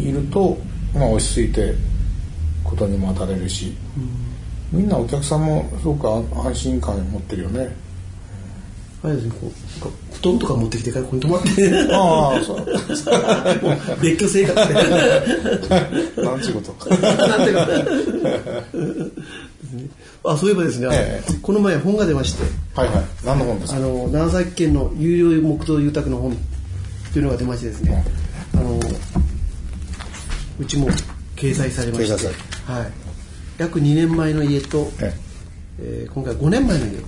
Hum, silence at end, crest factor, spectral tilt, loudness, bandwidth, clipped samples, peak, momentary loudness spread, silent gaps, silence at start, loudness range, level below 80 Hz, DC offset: none; 0 s; 16 dB; -6 dB/octave; -20 LUFS; 11 kHz; under 0.1%; -2 dBFS; 16 LU; none; 0 s; 7 LU; -28 dBFS; under 0.1%